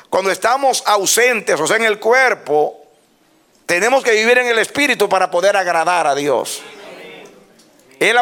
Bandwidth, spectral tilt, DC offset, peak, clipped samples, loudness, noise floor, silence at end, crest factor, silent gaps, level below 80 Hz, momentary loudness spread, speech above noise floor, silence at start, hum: 18 kHz; -1.5 dB/octave; under 0.1%; -2 dBFS; under 0.1%; -14 LUFS; -55 dBFS; 0 s; 14 dB; none; -66 dBFS; 11 LU; 40 dB; 0.1 s; none